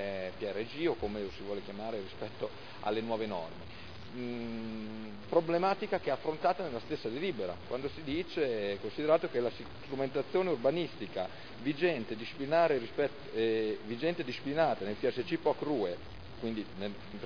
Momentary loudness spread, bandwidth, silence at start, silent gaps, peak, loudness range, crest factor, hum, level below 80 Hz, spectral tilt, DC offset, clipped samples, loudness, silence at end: 11 LU; 5.4 kHz; 0 s; none; -14 dBFS; 6 LU; 20 dB; none; -62 dBFS; -4 dB/octave; 0.4%; under 0.1%; -35 LUFS; 0 s